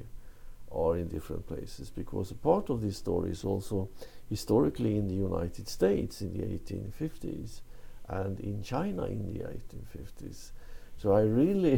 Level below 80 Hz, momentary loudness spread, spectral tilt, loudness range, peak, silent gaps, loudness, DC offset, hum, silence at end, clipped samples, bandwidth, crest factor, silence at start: -46 dBFS; 19 LU; -7.5 dB/octave; 7 LU; -12 dBFS; none; -32 LUFS; under 0.1%; none; 0 s; under 0.1%; 17 kHz; 20 dB; 0 s